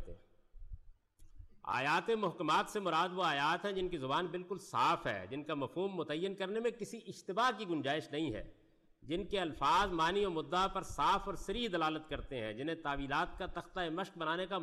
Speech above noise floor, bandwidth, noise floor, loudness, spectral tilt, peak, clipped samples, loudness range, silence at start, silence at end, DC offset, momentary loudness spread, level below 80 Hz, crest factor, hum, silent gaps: 22 dB; 13 kHz; -58 dBFS; -36 LUFS; -4.5 dB/octave; -24 dBFS; under 0.1%; 4 LU; 0 s; 0 s; under 0.1%; 9 LU; -56 dBFS; 14 dB; none; none